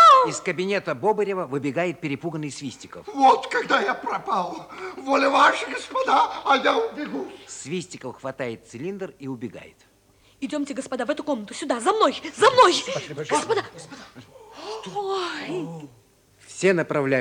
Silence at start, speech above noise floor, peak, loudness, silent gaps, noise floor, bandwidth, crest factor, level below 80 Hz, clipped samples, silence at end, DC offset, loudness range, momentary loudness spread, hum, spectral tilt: 0 s; 34 dB; -4 dBFS; -23 LUFS; none; -58 dBFS; 17.5 kHz; 20 dB; -66 dBFS; under 0.1%; 0 s; under 0.1%; 11 LU; 18 LU; none; -4 dB/octave